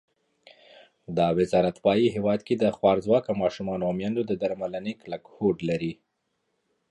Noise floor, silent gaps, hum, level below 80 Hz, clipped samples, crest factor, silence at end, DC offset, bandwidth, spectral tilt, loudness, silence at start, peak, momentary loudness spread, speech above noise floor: -76 dBFS; none; none; -58 dBFS; under 0.1%; 20 dB; 0.95 s; under 0.1%; 11 kHz; -7.5 dB/octave; -26 LUFS; 1.1 s; -6 dBFS; 10 LU; 51 dB